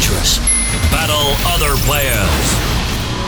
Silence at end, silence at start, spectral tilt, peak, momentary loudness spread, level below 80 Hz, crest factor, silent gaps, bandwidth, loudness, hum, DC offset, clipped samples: 0 s; 0 s; -3 dB/octave; -2 dBFS; 4 LU; -20 dBFS; 12 dB; none; over 20 kHz; -14 LUFS; none; under 0.1%; under 0.1%